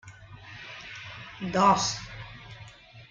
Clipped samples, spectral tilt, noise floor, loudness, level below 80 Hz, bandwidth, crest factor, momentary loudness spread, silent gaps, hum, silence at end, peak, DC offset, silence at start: under 0.1%; -3.5 dB/octave; -49 dBFS; -25 LUFS; -56 dBFS; 9.6 kHz; 22 dB; 25 LU; none; none; 0.05 s; -8 dBFS; under 0.1%; 0.05 s